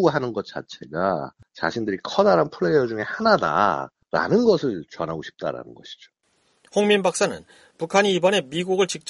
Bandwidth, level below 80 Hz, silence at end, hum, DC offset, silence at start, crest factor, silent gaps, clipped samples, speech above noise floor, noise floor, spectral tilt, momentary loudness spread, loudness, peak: 11.5 kHz; -60 dBFS; 0 s; none; under 0.1%; 0 s; 20 dB; none; under 0.1%; 42 dB; -64 dBFS; -4.5 dB/octave; 15 LU; -22 LUFS; -2 dBFS